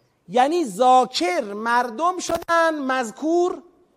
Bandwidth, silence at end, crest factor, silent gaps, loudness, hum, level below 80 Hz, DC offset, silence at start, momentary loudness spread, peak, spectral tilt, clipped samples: 15.5 kHz; 0.35 s; 16 dB; none; -21 LUFS; none; -60 dBFS; under 0.1%; 0.3 s; 8 LU; -4 dBFS; -3 dB/octave; under 0.1%